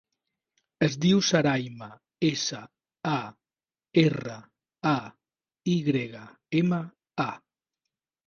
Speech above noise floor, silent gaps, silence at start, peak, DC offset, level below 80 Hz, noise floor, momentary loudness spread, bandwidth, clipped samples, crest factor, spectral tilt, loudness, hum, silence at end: over 64 dB; none; 0.8 s; -6 dBFS; under 0.1%; -64 dBFS; under -90 dBFS; 20 LU; 7.2 kHz; under 0.1%; 22 dB; -5.5 dB/octave; -27 LUFS; none; 0.9 s